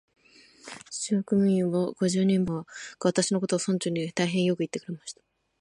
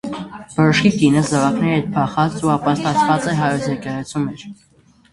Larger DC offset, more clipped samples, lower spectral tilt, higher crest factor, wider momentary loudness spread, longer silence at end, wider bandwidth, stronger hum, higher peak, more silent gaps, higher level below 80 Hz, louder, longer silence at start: neither; neither; about the same, -5.5 dB/octave vs -6 dB/octave; about the same, 18 dB vs 18 dB; first, 16 LU vs 12 LU; about the same, 0.5 s vs 0.6 s; about the same, 11.5 kHz vs 11.5 kHz; neither; second, -10 dBFS vs 0 dBFS; neither; second, -66 dBFS vs -50 dBFS; second, -27 LUFS vs -17 LUFS; first, 0.65 s vs 0.05 s